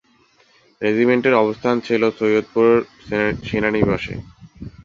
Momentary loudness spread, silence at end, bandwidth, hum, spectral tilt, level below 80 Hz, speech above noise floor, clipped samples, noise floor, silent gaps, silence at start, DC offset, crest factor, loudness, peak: 10 LU; 0.05 s; 7.4 kHz; none; -7 dB/octave; -46 dBFS; 39 dB; under 0.1%; -56 dBFS; none; 0.8 s; under 0.1%; 18 dB; -18 LUFS; -2 dBFS